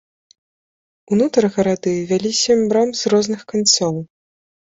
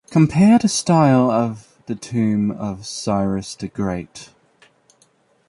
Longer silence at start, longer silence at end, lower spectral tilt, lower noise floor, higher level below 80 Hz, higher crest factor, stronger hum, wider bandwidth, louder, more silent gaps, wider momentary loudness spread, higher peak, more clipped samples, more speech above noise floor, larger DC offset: first, 1.1 s vs 0.1 s; second, 0.65 s vs 1.25 s; second, -4 dB/octave vs -6 dB/octave; first, under -90 dBFS vs -59 dBFS; second, -58 dBFS vs -50 dBFS; about the same, 18 dB vs 16 dB; neither; second, 8 kHz vs 11.5 kHz; about the same, -17 LUFS vs -18 LUFS; neither; second, 7 LU vs 17 LU; about the same, 0 dBFS vs -2 dBFS; neither; first, over 73 dB vs 41 dB; neither